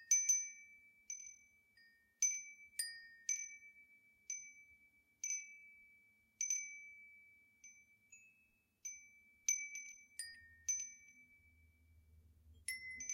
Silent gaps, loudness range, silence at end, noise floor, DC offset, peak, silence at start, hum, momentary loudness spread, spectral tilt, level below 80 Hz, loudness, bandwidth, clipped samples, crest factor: none; 4 LU; 0 s; -77 dBFS; under 0.1%; -22 dBFS; 0 s; none; 25 LU; 3.5 dB/octave; -80 dBFS; -41 LUFS; 16 kHz; under 0.1%; 24 dB